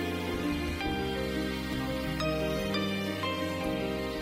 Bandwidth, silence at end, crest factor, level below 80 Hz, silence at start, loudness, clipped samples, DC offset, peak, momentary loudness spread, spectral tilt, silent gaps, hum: 16 kHz; 0 s; 12 dB; -44 dBFS; 0 s; -32 LUFS; under 0.1%; under 0.1%; -18 dBFS; 2 LU; -5.5 dB/octave; none; none